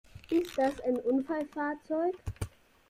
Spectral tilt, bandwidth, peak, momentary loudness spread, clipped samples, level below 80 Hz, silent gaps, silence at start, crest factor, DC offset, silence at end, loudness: -6.5 dB/octave; 15.5 kHz; -16 dBFS; 11 LU; under 0.1%; -54 dBFS; none; 0.15 s; 16 dB; under 0.1%; 0.4 s; -32 LUFS